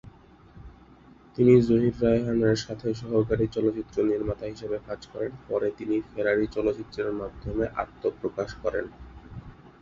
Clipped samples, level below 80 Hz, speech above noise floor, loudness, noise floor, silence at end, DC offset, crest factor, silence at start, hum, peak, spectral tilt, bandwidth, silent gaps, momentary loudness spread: under 0.1%; -48 dBFS; 27 dB; -27 LUFS; -53 dBFS; 0.15 s; under 0.1%; 20 dB; 0.05 s; none; -6 dBFS; -7.5 dB/octave; 7.4 kHz; none; 12 LU